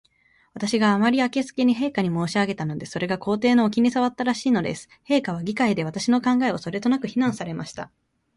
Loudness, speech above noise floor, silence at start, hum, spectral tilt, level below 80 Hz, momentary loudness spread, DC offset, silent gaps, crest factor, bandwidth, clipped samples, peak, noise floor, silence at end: -23 LUFS; 39 dB; 0.55 s; none; -5.5 dB/octave; -60 dBFS; 11 LU; under 0.1%; none; 16 dB; 11.5 kHz; under 0.1%; -8 dBFS; -62 dBFS; 0.5 s